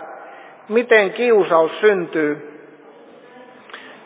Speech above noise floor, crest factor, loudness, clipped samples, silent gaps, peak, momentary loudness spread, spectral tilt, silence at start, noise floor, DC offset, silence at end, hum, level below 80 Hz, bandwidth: 28 dB; 18 dB; -16 LUFS; under 0.1%; none; 0 dBFS; 23 LU; -8.5 dB/octave; 0 s; -44 dBFS; under 0.1%; 0.15 s; none; -84 dBFS; 4 kHz